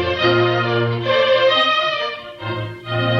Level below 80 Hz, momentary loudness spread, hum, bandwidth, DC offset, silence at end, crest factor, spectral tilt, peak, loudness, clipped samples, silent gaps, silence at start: -52 dBFS; 12 LU; none; 7.4 kHz; under 0.1%; 0 s; 16 dB; -6 dB/octave; -2 dBFS; -17 LUFS; under 0.1%; none; 0 s